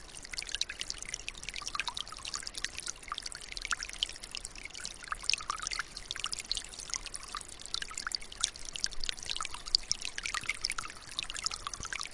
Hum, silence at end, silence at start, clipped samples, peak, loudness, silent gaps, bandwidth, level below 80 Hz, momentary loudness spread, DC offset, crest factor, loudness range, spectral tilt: none; 0 s; 0 s; under 0.1%; -6 dBFS; -36 LUFS; none; 11.5 kHz; -52 dBFS; 8 LU; under 0.1%; 32 dB; 4 LU; 1 dB/octave